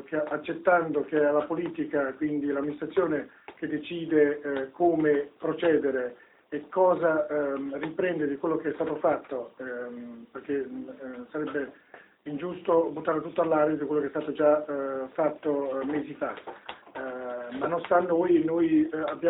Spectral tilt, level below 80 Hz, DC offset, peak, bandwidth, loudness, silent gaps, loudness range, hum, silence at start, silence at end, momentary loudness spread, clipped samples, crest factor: -10.5 dB/octave; -68 dBFS; under 0.1%; -10 dBFS; 4 kHz; -28 LUFS; none; 6 LU; none; 0 s; 0 s; 14 LU; under 0.1%; 18 dB